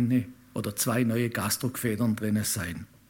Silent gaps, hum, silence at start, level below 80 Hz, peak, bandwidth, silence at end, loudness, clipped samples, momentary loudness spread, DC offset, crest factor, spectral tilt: none; none; 0 s; -58 dBFS; -12 dBFS; 17 kHz; 0.25 s; -28 LUFS; under 0.1%; 8 LU; under 0.1%; 16 dB; -5 dB/octave